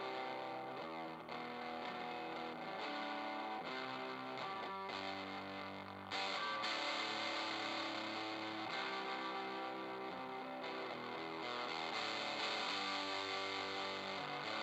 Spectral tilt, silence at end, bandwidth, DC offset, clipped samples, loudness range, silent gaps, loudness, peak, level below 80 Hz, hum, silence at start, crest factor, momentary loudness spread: -3 dB/octave; 0 s; 16.5 kHz; under 0.1%; under 0.1%; 4 LU; none; -43 LUFS; -28 dBFS; -86 dBFS; none; 0 s; 16 dB; 7 LU